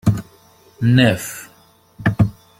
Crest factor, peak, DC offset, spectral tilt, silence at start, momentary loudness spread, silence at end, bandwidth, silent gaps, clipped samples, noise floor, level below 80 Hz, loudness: 18 dB; -2 dBFS; under 0.1%; -6 dB/octave; 0.05 s; 15 LU; 0.3 s; 16 kHz; none; under 0.1%; -52 dBFS; -42 dBFS; -18 LUFS